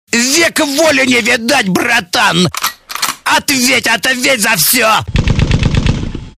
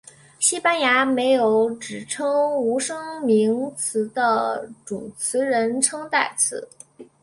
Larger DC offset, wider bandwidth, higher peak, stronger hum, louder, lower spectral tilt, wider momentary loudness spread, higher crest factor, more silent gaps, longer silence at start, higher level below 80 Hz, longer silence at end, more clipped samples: first, 0.2% vs under 0.1%; first, 16 kHz vs 11.5 kHz; about the same, 0 dBFS vs -2 dBFS; neither; first, -11 LUFS vs -21 LUFS; about the same, -3 dB/octave vs -2.5 dB/octave; second, 8 LU vs 11 LU; second, 12 dB vs 20 dB; neither; second, 0.1 s vs 0.4 s; first, -24 dBFS vs -68 dBFS; about the same, 0.1 s vs 0.2 s; neither